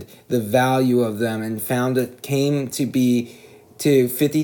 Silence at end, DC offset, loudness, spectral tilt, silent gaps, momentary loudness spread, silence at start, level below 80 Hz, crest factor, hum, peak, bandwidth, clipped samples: 0 s; under 0.1%; -20 LUFS; -6 dB/octave; none; 7 LU; 0 s; -68 dBFS; 16 dB; none; -4 dBFS; over 20 kHz; under 0.1%